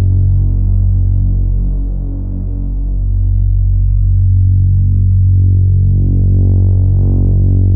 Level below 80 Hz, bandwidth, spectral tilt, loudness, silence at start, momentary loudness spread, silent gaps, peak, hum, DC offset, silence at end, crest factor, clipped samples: -14 dBFS; 0.9 kHz; -16.5 dB/octave; -13 LUFS; 0 s; 9 LU; none; -2 dBFS; none; under 0.1%; 0 s; 8 dB; under 0.1%